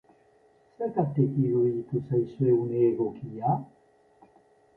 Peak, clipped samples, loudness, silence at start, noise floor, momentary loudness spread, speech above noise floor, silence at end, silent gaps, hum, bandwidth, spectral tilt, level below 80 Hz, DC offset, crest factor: -12 dBFS; under 0.1%; -27 LUFS; 0.8 s; -62 dBFS; 7 LU; 36 dB; 1.1 s; none; none; 3 kHz; -12.5 dB/octave; -64 dBFS; under 0.1%; 16 dB